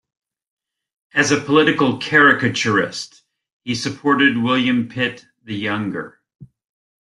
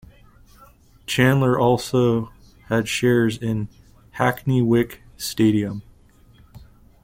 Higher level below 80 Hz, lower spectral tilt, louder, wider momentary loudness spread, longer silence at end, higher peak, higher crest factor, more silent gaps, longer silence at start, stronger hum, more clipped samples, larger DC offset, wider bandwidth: second, -58 dBFS vs -48 dBFS; second, -4.5 dB/octave vs -6 dB/octave; first, -17 LUFS vs -21 LUFS; first, 17 LU vs 14 LU; first, 0.65 s vs 0.4 s; first, 0 dBFS vs -4 dBFS; about the same, 18 dB vs 18 dB; first, 3.52-3.60 s, 6.35-6.39 s vs none; about the same, 1.15 s vs 1.1 s; neither; neither; neither; second, 11.5 kHz vs 16.5 kHz